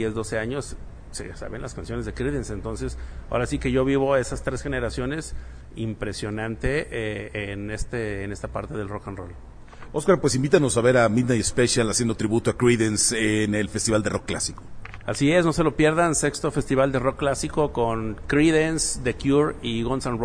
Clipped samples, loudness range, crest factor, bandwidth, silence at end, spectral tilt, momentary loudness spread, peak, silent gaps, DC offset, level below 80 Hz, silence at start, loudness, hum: under 0.1%; 9 LU; 20 dB; 11 kHz; 0 s; -4.5 dB/octave; 15 LU; -4 dBFS; none; under 0.1%; -38 dBFS; 0 s; -24 LUFS; none